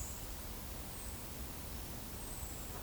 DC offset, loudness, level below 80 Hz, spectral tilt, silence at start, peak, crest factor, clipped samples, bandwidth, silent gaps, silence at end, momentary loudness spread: under 0.1%; -44 LUFS; -50 dBFS; -3.5 dB/octave; 0 s; -30 dBFS; 14 dB; under 0.1%; over 20 kHz; none; 0 s; 1 LU